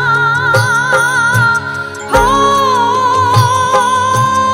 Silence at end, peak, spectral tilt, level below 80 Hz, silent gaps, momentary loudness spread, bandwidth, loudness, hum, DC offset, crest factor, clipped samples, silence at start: 0 s; 0 dBFS; -4 dB/octave; -34 dBFS; none; 2 LU; 16.5 kHz; -11 LUFS; none; under 0.1%; 10 dB; under 0.1%; 0 s